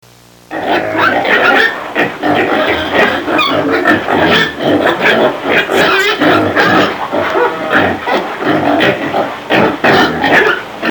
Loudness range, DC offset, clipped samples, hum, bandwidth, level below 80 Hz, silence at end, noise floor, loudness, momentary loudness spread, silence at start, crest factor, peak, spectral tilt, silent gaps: 2 LU; 0.1%; 0.2%; none; 20 kHz; -46 dBFS; 0 s; -38 dBFS; -11 LUFS; 6 LU; 0.5 s; 12 dB; 0 dBFS; -4.5 dB/octave; none